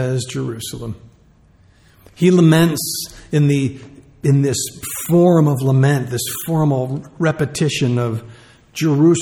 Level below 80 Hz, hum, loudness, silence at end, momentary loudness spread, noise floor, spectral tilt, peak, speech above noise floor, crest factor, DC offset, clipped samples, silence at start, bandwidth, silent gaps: -50 dBFS; none; -17 LUFS; 0 s; 14 LU; -51 dBFS; -6 dB/octave; -2 dBFS; 35 dB; 16 dB; under 0.1%; under 0.1%; 0 s; 18.5 kHz; none